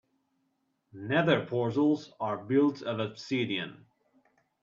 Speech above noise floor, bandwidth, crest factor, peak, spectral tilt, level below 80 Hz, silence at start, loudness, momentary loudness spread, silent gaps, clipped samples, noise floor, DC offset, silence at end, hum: 48 dB; 7.4 kHz; 20 dB; -12 dBFS; -7 dB/octave; -74 dBFS; 0.95 s; -29 LUFS; 9 LU; none; under 0.1%; -77 dBFS; under 0.1%; 0.85 s; none